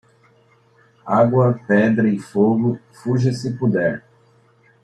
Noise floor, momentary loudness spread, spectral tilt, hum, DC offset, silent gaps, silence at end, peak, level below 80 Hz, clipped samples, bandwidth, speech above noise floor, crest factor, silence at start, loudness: -55 dBFS; 8 LU; -8.5 dB/octave; none; under 0.1%; none; 0.85 s; -2 dBFS; -60 dBFS; under 0.1%; 10 kHz; 38 dB; 16 dB; 1.05 s; -18 LUFS